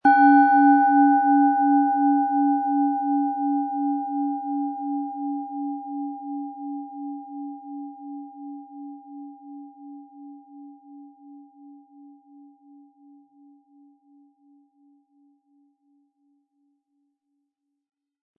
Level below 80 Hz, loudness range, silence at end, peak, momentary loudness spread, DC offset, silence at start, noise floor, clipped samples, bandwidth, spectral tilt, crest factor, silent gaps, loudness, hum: -86 dBFS; 25 LU; 6.65 s; -6 dBFS; 26 LU; under 0.1%; 0.05 s; -79 dBFS; under 0.1%; 4.5 kHz; -8 dB/octave; 18 dB; none; -21 LUFS; none